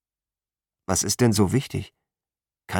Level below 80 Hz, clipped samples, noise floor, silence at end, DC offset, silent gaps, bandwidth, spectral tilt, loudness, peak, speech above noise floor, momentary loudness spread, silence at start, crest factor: -52 dBFS; under 0.1%; under -90 dBFS; 0 s; under 0.1%; none; 19 kHz; -4.5 dB/octave; -22 LUFS; -8 dBFS; over 68 dB; 19 LU; 0.9 s; 18 dB